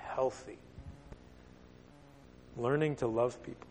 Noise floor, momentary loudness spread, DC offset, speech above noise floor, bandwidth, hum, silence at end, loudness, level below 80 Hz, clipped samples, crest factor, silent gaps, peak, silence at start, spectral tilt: -57 dBFS; 26 LU; under 0.1%; 23 dB; 9.4 kHz; none; 0 s; -34 LUFS; -60 dBFS; under 0.1%; 20 dB; none; -18 dBFS; 0 s; -7 dB/octave